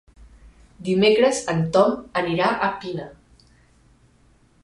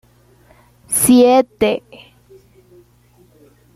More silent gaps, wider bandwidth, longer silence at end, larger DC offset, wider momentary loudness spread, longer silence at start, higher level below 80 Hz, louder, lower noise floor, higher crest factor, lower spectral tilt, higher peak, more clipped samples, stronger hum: neither; second, 11.5 kHz vs 15 kHz; second, 1.5 s vs 2 s; neither; first, 16 LU vs 10 LU; second, 0.2 s vs 0.9 s; about the same, -54 dBFS vs -50 dBFS; second, -20 LUFS vs -13 LUFS; first, -57 dBFS vs -52 dBFS; about the same, 20 dB vs 16 dB; first, -5 dB/octave vs -3.5 dB/octave; about the same, -4 dBFS vs -2 dBFS; neither; second, none vs 60 Hz at -45 dBFS